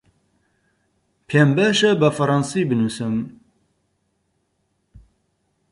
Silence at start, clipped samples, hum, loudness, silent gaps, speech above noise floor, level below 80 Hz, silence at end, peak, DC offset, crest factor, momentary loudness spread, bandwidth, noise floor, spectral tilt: 1.3 s; under 0.1%; none; -19 LUFS; none; 52 dB; -58 dBFS; 2.4 s; -4 dBFS; under 0.1%; 18 dB; 9 LU; 11.5 kHz; -70 dBFS; -5.5 dB/octave